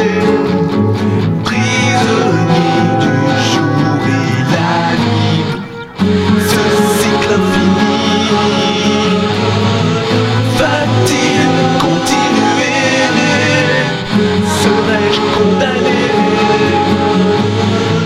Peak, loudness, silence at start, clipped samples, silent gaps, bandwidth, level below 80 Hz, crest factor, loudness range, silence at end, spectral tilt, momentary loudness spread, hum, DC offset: 0 dBFS; -12 LUFS; 0 s; under 0.1%; none; 15.5 kHz; -42 dBFS; 12 dB; 1 LU; 0 s; -5 dB/octave; 2 LU; none; under 0.1%